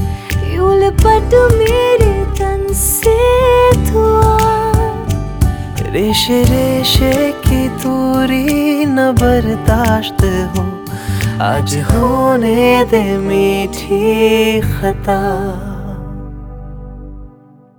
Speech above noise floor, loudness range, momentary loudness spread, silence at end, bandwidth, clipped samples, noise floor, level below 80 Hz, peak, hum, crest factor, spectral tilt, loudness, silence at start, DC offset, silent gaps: 30 dB; 4 LU; 11 LU; 0.5 s; over 20 kHz; under 0.1%; -42 dBFS; -22 dBFS; 0 dBFS; 50 Hz at -40 dBFS; 12 dB; -5.5 dB/octave; -13 LUFS; 0 s; under 0.1%; none